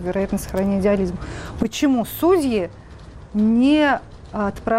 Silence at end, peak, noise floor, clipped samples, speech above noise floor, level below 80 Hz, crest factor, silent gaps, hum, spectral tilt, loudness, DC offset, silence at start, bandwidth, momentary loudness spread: 0 s; -8 dBFS; -39 dBFS; under 0.1%; 20 dB; -40 dBFS; 12 dB; none; none; -6 dB/octave; -20 LUFS; under 0.1%; 0 s; 16 kHz; 12 LU